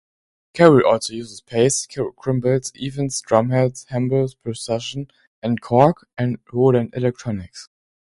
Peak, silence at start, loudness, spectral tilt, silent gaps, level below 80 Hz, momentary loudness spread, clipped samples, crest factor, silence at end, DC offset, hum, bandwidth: 0 dBFS; 0.55 s; -20 LUFS; -5.5 dB/octave; 5.27-5.42 s; -52 dBFS; 14 LU; under 0.1%; 20 dB; 0.55 s; under 0.1%; none; 11.5 kHz